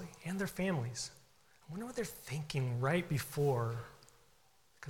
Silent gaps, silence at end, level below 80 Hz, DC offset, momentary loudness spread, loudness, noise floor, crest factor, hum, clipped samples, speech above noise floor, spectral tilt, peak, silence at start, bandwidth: none; 0 s; -64 dBFS; under 0.1%; 12 LU; -38 LUFS; -70 dBFS; 18 dB; none; under 0.1%; 33 dB; -5.5 dB/octave; -22 dBFS; 0 s; 18 kHz